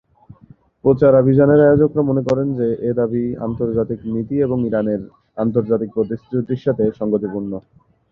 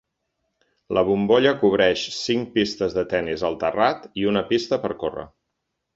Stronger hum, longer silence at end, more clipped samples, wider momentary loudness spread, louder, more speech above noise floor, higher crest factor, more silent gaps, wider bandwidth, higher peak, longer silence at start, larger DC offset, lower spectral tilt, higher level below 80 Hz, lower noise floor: neither; second, 0.5 s vs 0.7 s; neither; first, 11 LU vs 8 LU; first, -18 LUFS vs -22 LUFS; second, 32 dB vs 57 dB; about the same, 16 dB vs 18 dB; neither; second, 6.6 kHz vs 7.8 kHz; about the same, -2 dBFS vs -4 dBFS; about the same, 0.85 s vs 0.9 s; neither; first, -10.5 dB/octave vs -5 dB/octave; first, -48 dBFS vs -54 dBFS; second, -48 dBFS vs -78 dBFS